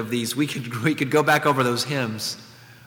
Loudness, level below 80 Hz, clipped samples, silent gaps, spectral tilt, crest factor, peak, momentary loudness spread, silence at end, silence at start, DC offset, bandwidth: -22 LUFS; -68 dBFS; under 0.1%; none; -4.5 dB/octave; 18 dB; -4 dBFS; 10 LU; 0.15 s; 0 s; under 0.1%; 19 kHz